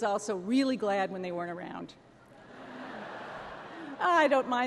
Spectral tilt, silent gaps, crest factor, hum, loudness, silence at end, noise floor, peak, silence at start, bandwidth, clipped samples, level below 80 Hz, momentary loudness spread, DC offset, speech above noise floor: -4.5 dB/octave; none; 18 dB; none; -30 LUFS; 0 s; -53 dBFS; -14 dBFS; 0 s; 12 kHz; under 0.1%; -72 dBFS; 19 LU; under 0.1%; 24 dB